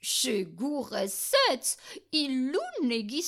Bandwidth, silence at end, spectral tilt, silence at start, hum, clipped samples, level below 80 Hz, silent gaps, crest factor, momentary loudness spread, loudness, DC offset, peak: 16.5 kHz; 0 s; -2 dB/octave; 0.05 s; none; under 0.1%; -76 dBFS; none; 18 dB; 8 LU; -28 LUFS; under 0.1%; -12 dBFS